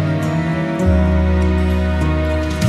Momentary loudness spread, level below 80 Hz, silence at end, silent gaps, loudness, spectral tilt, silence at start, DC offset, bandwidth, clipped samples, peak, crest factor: 4 LU; -22 dBFS; 0 s; none; -17 LUFS; -7.5 dB/octave; 0 s; under 0.1%; 11.5 kHz; under 0.1%; -4 dBFS; 12 dB